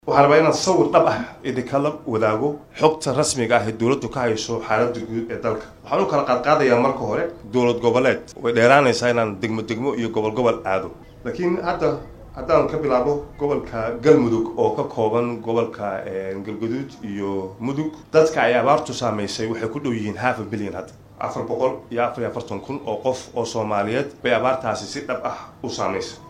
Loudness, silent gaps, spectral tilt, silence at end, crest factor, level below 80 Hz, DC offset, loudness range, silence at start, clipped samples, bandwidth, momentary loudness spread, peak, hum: -21 LUFS; none; -5 dB/octave; 0 s; 20 dB; -50 dBFS; under 0.1%; 6 LU; 0.05 s; under 0.1%; 12.5 kHz; 11 LU; 0 dBFS; none